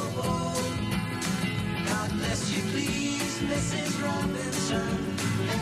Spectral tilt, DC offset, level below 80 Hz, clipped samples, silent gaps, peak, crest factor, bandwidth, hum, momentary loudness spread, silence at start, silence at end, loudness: -4.5 dB/octave; under 0.1%; -48 dBFS; under 0.1%; none; -16 dBFS; 14 dB; 15.5 kHz; none; 2 LU; 0 s; 0 s; -29 LUFS